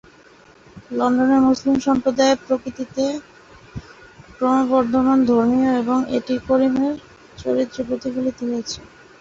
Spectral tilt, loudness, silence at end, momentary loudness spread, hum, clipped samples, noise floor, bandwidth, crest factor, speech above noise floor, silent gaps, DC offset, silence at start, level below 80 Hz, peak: -5 dB/octave; -19 LUFS; 0.35 s; 15 LU; none; under 0.1%; -49 dBFS; 7.6 kHz; 16 dB; 30 dB; none; under 0.1%; 0.75 s; -50 dBFS; -4 dBFS